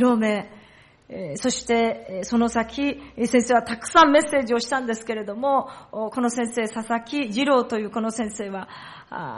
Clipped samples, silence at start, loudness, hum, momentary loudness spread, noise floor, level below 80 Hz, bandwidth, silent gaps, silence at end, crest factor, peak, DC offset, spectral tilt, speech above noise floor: under 0.1%; 0 s; -23 LUFS; none; 14 LU; -52 dBFS; -56 dBFS; 11.5 kHz; none; 0 s; 18 dB; -4 dBFS; under 0.1%; -4 dB/octave; 29 dB